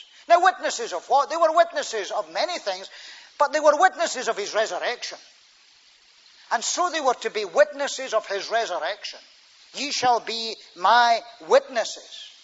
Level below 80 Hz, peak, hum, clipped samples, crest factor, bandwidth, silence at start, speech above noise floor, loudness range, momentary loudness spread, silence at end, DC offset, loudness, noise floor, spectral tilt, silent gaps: -84 dBFS; -4 dBFS; none; under 0.1%; 20 dB; 8 kHz; 0.3 s; 32 dB; 4 LU; 15 LU; 0.15 s; under 0.1%; -23 LUFS; -55 dBFS; -0.5 dB/octave; none